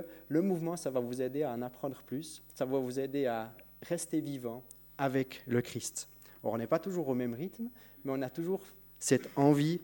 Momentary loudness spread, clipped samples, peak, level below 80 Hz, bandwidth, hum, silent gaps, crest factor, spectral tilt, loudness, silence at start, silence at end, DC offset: 12 LU; under 0.1%; -12 dBFS; -70 dBFS; 16.5 kHz; none; none; 22 dB; -5.5 dB/octave; -35 LUFS; 0 s; 0 s; under 0.1%